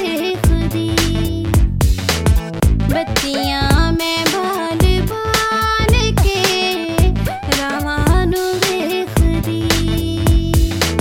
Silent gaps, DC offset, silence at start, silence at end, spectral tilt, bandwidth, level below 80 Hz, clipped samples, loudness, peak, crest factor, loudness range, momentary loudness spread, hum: none; under 0.1%; 0 s; 0 s; -5 dB/octave; 16.5 kHz; -20 dBFS; under 0.1%; -16 LUFS; 0 dBFS; 14 dB; 1 LU; 4 LU; none